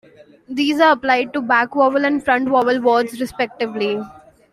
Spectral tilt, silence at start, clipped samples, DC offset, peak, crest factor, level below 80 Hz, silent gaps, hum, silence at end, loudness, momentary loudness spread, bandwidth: -4.5 dB/octave; 0.5 s; under 0.1%; under 0.1%; -2 dBFS; 16 dB; -58 dBFS; none; none; 0.4 s; -17 LUFS; 9 LU; 14 kHz